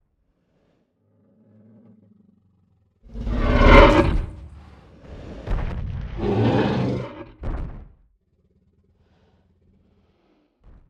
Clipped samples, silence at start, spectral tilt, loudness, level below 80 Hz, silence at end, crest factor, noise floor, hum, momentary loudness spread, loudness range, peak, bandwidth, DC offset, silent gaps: under 0.1%; 3.15 s; -7.5 dB/octave; -20 LUFS; -28 dBFS; 3.05 s; 22 dB; -68 dBFS; none; 28 LU; 17 LU; 0 dBFS; 7.8 kHz; under 0.1%; none